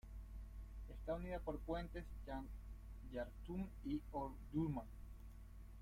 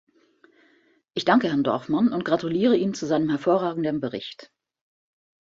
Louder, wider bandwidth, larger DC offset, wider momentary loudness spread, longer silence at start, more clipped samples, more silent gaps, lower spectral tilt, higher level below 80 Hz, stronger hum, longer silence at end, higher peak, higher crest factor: second, -49 LUFS vs -23 LUFS; first, 16 kHz vs 7.8 kHz; neither; first, 14 LU vs 10 LU; second, 0.05 s vs 1.15 s; neither; neither; first, -8 dB/octave vs -6 dB/octave; first, -54 dBFS vs -66 dBFS; neither; second, 0 s vs 1.05 s; second, -30 dBFS vs -4 dBFS; about the same, 18 dB vs 20 dB